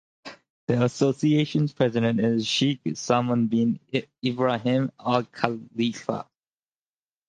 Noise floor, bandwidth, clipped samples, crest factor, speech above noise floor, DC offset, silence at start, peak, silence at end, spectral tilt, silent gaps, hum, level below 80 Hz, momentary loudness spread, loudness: under -90 dBFS; 9.4 kHz; under 0.1%; 24 dB; over 66 dB; under 0.1%; 0.25 s; -2 dBFS; 1.05 s; -6 dB/octave; 0.50-0.67 s; none; -64 dBFS; 9 LU; -25 LUFS